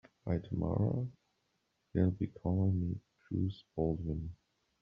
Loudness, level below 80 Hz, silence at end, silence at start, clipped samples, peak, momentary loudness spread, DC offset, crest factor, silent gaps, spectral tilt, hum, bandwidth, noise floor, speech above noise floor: -36 LUFS; -56 dBFS; 0.45 s; 0.25 s; under 0.1%; -16 dBFS; 9 LU; under 0.1%; 20 dB; none; -10 dB/octave; none; 5.2 kHz; -80 dBFS; 46 dB